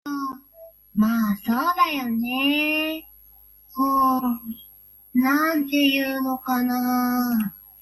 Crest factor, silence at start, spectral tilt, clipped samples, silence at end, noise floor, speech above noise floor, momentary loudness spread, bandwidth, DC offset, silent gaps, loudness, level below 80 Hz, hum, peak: 16 dB; 0.05 s; -4 dB/octave; under 0.1%; 0.2 s; -51 dBFS; 29 dB; 12 LU; 16 kHz; under 0.1%; none; -22 LUFS; -60 dBFS; none; -8 dBFS